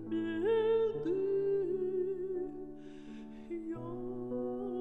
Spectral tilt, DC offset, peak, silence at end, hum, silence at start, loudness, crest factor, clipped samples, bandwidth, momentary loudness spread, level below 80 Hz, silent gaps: -8.5 dB/octave; 0.2%; -22 dBFS; 0 s; none; 0 s; -35 LUFS; 12 dB; under 0.1%; 4.2 kHz; 17 LU; -60 dBFS; none